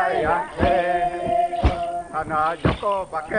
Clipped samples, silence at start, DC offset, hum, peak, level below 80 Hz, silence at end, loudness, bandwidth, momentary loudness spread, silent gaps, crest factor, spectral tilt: under 0.1%; 0 s; under 0.1%; none; -6 dBFS; -32 dBFS; 0 s; -22 LUFS; 10 kHz; 6 LU; none; 16 dB; -6.5 dB/octave